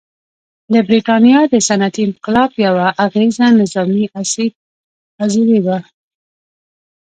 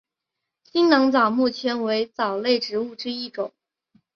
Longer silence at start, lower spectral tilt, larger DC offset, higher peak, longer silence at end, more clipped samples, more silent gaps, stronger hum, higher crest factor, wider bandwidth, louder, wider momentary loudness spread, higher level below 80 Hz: about the same, 0.7 s vs 0.75 s; about the same, -5 dB/octave vs -5 dB/octave; neither; about the same, 0 dBFS vs -2 dBFS; first, 1.2 s vs 0.65 s; neither; first, 4.55-5.18 s vs none; neither; second, 14 dB vs 20 dB; first, 9.4 kHz vs 6.8 kHz; first, -13 LUFS vs -22 LUFS; second, 9 LU vs 12 LU; first, -56 dBFS vs -70 dBFS